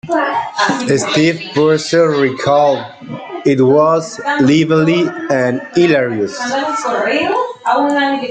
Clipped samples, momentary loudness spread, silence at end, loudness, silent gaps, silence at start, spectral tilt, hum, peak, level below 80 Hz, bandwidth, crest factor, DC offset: under 0.1%; 7 LU; 0 s; -14 LUFS; none; 0.05 s; -5.5 dB/octave; none; -2 dBFS; -56 dBFS; 9.4 kHz; 12 dB; under 0.1%